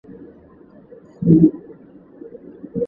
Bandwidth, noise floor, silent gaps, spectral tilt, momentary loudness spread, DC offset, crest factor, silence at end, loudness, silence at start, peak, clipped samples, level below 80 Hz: 2 kHz; -46 dBFS; none; -14 dB/octave; 26 LU; under 0.1%; 20 dB; 0 s; -16 LUFS; 0.1 s; 0 dBFS; under 0.1%; -50 dBFS